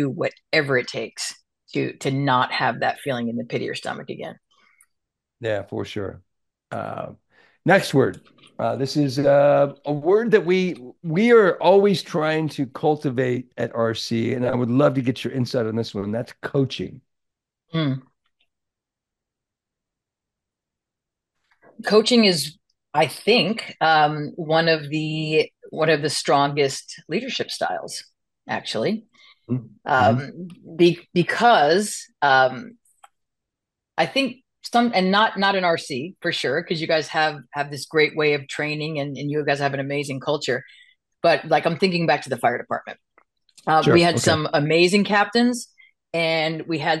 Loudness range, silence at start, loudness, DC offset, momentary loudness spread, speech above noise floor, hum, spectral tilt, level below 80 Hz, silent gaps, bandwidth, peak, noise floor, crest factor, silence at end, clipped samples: 9 LU; 0 s; -21 LUFS; under 0.1%; 13 LU; 65 dB; none; -5 dB/octave; -66 dBFS; none; 12.5 kHz; -2 dBFS; -86 dBFS; 20 dB; 0 s; under 0.1%